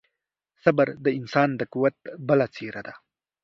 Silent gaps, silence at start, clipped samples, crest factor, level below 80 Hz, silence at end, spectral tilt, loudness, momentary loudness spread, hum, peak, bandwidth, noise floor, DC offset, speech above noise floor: none; 0.65 s; under 0.1%; 24 dB; -68 dBFS; 0.45 s; -8 dB/octave; -24 LUFS; 14 LU; none; -2 dBFS; 7 kHz; -82 dBFS; under 0.1%; 58 dB